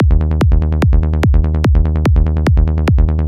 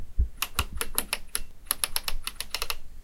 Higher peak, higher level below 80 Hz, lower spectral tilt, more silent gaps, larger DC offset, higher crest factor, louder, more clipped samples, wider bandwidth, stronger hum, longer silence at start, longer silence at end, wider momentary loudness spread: about the same, -2 dBFS vs -2 dBFS; first, -12 dBFS vs -34 dBFS; first, -8.5 dB/octave vs -1.5 dB/octave; neither; first, 0.3% vs under 0.1%; second, 10 dB vs 28 dB; first, -14 LUFS vs -31 LUFS; neither; second, 7.2 kHz vs 17 kHz; neither; about the same, 0 s vs 0 s; about the same, 0 s vs 0 s; second, 0 LU vs 6 LU